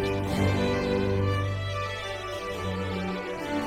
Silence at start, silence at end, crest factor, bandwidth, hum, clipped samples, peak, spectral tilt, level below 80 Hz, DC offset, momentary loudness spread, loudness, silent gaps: 0 s; 0 s; 16 dB; 15.5 kHz; none; under 0.1%; -12 dBFS; -6.5 dB/octave; -46 dBFS; under 0.1%; 7 LU; -29 LUFS; none